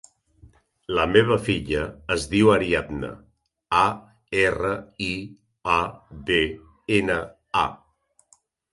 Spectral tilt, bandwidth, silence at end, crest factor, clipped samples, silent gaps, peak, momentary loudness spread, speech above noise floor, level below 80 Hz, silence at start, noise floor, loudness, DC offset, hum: -5.5 dB/octave; 11.5 kHz; 0.95 s; 22 dB; under 0.1%; none; -2 dBFS; 15 LU; 42 dB; -46 dBFS; 0.9 s; -65 dBFS; -23 LUFS; under 0.1%; none